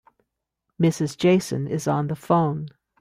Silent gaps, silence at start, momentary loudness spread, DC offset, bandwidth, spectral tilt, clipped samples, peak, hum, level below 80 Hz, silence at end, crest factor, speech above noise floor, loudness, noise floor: none; 0.8 s; 7 LU; under 0.1%; 15 kHz; -6.5 dB/octave; under 0.1%; -6 dBFS; none; -60 dBFS; 0.3 s; 18 dB; 58 dB; -23 LUFS; -80 dBFS